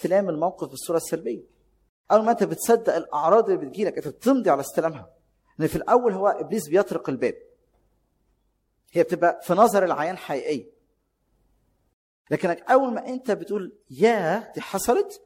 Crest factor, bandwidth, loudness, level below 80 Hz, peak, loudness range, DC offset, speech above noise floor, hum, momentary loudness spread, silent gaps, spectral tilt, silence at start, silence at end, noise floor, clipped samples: 20 dB; 16.5 kHz; -23 LUFS; -60 dBFS; -4 dBFS; 4 LU; under 0.1%; 48 dB; none; 10 LU; 1.89-2.04 s, 11.93-12.25 s; -5.5 dB/octave; 0 s; 0.1 s; -71 dBFS; under 0.1%